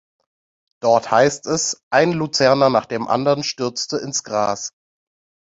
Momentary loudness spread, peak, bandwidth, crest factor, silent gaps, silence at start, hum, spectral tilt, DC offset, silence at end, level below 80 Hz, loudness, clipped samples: 9 LU; -2 dBFS; 8 kHz; 18 dB; 1.83-1.91 s; 0.85 s; none; -3.5 dB/octave; under 0.1%; 0.8 s; -60 dBFS; -18 LUFS; under 0.1%